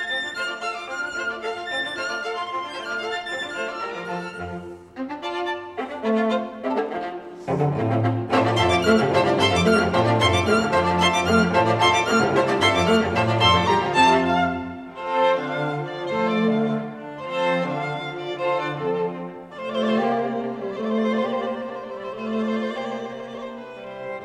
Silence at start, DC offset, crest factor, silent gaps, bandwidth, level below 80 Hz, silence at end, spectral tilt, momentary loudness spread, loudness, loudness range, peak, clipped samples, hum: 0 s; under 0.1%; 18 dB; none; 13.5 kHz; -52 dBFS; 0 s; -5 dB/octave; 15 LU; -22 LUFS; 9 LU; -4 dBFS; under 0.1%; none